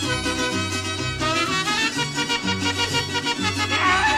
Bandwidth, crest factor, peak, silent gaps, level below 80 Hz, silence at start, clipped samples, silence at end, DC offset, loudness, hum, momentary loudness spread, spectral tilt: 16 kHz; 16 dB; -8 dBFS; none; -44 dBFS; 0 s; under 0.1%; 0 s; under 0.1%; -22 LUFS; none; 4 LU; -3 dB/octave